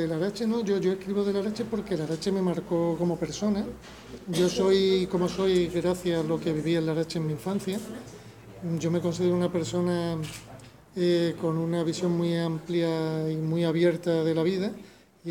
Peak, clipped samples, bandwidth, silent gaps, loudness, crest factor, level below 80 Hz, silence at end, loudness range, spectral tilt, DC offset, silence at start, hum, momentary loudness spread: -12 dBFS; under 0.1%; 17 kHz; none; -27 LUFS; 16 dB; -56 dBFS; 0 s; 3 LU; -6.5 dB/octave; under 0.1%; 0 s; none; 13 LU